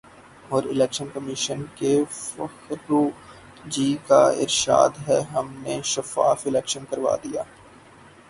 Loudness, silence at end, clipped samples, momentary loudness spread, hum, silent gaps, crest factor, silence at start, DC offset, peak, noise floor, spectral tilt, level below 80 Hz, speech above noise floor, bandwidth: -23 LUFS; 0.85 s; under 0.1%; 14 LU; none; none; 22 dB; 0.45 s; under 0.1%; -2 dBFS; -49 dBFS; -4 dB/octave; -60 dBFS; 26 dB; 11.5 kHz